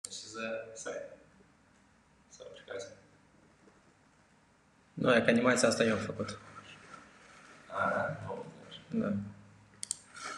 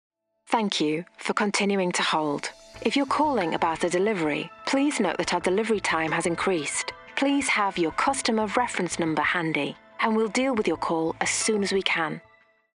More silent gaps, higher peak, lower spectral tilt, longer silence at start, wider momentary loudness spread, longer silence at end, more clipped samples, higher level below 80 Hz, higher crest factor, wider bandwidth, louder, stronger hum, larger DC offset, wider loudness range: neither; second, -12 dBFS vs -6 dBFS; about the same, -4 dB/octave vs -3.5 dB/octave; second, 0.05 s vs 0.5 s; first, 24 LU vs 5 LU; second, 0 s vs 0.6 s; neither; second, -70 dBFS vs -58 dBFS; first, 26 dB vs 20 dB; about the same, 12 kHz vs 11.5 kHz; second, -33 LUFS vs -25 LUFS; neither; neither; first, 21 LU vs 1 LU